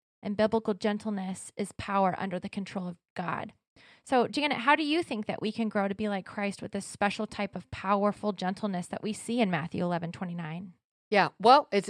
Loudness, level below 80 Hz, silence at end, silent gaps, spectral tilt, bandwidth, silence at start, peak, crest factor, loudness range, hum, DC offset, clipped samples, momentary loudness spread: -30 LUFS; -66 dBFS; 0 s; 3.10-3.16 s, 3.67-3.76 s, 10.85-11.11 s; -5.5 dB/octave; 12.5 kHz; 0.25 s; -6 dBFS; 24 dB; 3 LU; none; under 0.1%; under 0.1%; 13 LU